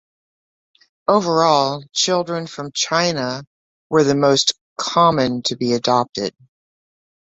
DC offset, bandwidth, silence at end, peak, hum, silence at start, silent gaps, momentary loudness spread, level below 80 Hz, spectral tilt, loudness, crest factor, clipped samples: under 0.1%; 8.2 kHz; 1 s; -2 dBFS; none; 1.1 s; 3.47-3.90 s, 4.61-4.76 s; 11 LU; -58 dBFS; -4 dB/octave; -18 LUFS; 18 dB; under 0.1%